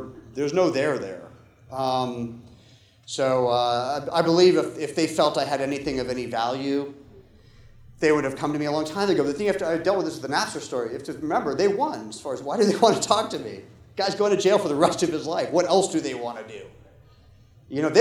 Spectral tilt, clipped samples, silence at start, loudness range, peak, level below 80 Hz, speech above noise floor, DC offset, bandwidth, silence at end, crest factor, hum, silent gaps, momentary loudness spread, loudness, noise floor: -4.5 dB/octave; under 0.1%; 0 s; 4 LU; -2 dBFS; -58 dBFS; 31 dB; under 0.1%; 13.5 kHz; 0 s; 22 dB; none; none; 14 LU; -24 LUFS; -54 dBFS